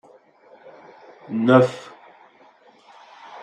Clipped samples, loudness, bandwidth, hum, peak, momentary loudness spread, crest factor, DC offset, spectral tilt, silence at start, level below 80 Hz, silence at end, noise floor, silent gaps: under 0.1%; -18 LUFS; 9.4 kHz; none; -2 dBFS; 27 LU; 22 dB; under 0.1%; -7.5 dB/octave; 1.3 s; -72 dBFS; 0 s; -53 dBFS; none